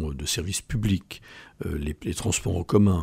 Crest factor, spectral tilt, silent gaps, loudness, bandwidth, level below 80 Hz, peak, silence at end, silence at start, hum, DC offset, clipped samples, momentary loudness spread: 18 dB; -5 dB/octave; none; -27 LUFS; 16 kHz; -40 dBFS; -8 dBFS; 0 s; 0 s; none; under 0.1%; under 0.1%; 16 LU